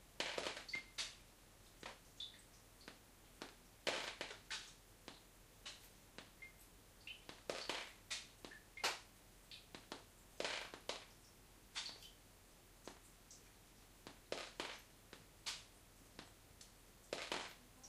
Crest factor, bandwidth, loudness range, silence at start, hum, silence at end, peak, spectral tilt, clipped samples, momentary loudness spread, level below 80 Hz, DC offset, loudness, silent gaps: 30 dB; 15.5 kHz; 6 LU; 0 s; none; 0 s; -22 dBFS; -1.5 dB/octave; under 0.1%; 19 LU; -70 dBFS; under 0.1%; -49 LUFS; none